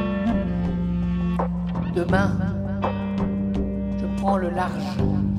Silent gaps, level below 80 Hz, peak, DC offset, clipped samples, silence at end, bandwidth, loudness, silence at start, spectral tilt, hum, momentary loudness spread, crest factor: none; -34 dBFS; -8 dBFS; under 0.1%; under 0.1%; 0 s; 10.5 kHz; -24 LUFS; 0 s; -8.5 dB/octave; none; 4 LU; 16 dB